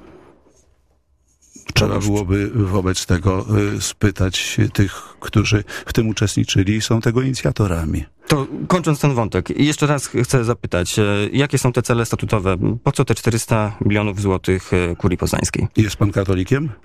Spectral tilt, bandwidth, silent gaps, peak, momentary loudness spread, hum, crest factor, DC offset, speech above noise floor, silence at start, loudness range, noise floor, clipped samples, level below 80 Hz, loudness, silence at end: -5.5 dB/octave; 15.5 kHz; none; -2 dBFS; 3 LU; none; 16 dB; under 0.1%; 43 dB; 0.05 s; 1 LU; -60 dBFS; under 0.1%; -36 dBFS; -19 LUFS; 0.1 s